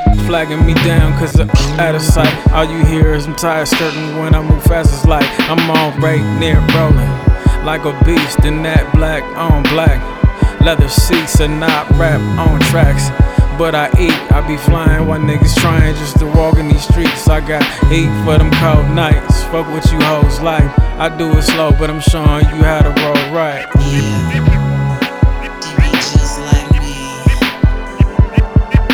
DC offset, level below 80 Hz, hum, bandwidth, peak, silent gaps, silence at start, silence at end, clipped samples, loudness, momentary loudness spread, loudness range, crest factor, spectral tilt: under 0.1%; -16 dBFS; none; over 20 kHz; 0 dBFS; none; 0 s; 0 s; 0.3%; -12 LUFS; 4 LU; 2 LU; 10 dB; -6 dB/octave